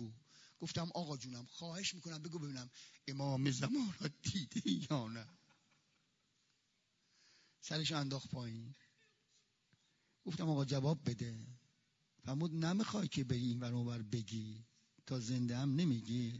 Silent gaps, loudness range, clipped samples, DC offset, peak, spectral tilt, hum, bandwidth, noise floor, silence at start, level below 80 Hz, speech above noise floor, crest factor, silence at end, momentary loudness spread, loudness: none; 5 LU; under 0.1%; under 0.1%; -22 dBFS; -5.5 dB/octave; none; 7.4 kHz; -81 dBFS; 0 s; -76 dBFS; 40 dB; 20 dB; 0 s; 15 LU; -41 LUFS